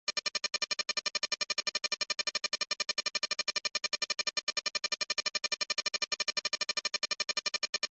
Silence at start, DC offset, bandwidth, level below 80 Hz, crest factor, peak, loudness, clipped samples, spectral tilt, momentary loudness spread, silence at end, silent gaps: 0.1 s; under 0.1%; 8.6 kHz; -80 dBFS; 16 dB; -18 dBFS; -32 LUFS; under 0.1%; 2 dB/octave; 1 LU; 0.05 s; 4.43-4.47 s, 7.69-7.73 s